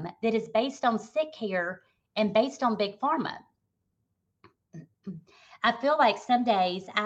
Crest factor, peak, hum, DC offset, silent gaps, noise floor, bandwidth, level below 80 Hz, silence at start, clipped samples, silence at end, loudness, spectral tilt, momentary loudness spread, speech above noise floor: 18 dB; -10 dBFS; none; under 0.1%; none; -78 dBFS; 8.4 kHz; -76 dBFS; 0 s; under 0.1%; 0 s; -27 LUFS; -5 dB/octave; 20 LU; 51 dB